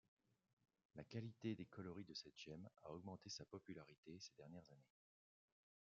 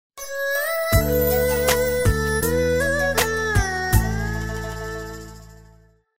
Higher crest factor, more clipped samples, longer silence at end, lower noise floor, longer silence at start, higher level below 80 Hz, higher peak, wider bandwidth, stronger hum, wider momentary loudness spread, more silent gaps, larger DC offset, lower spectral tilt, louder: about the same, 20 dB vs 18 dB; neither; first, 1 s vs 0 s; first, under -90 dBFS vs -53 dBFS; first, 0.95 s vs 0.1 s; second, -86 dBFS vs -30 dBFS; second, -36 dBFS vs -4 dBFS; second, 7.2 kHz vs 16.5 kHz; neither; about the same, 11 LU vs 12 LU; first, 3.98-4.03 s vs none; second, under 0.1% vs 0.7%; about the same, -5.5 dB/octave vs -4.5 dB/octave; second, -56 LUFS vs -21 LUFS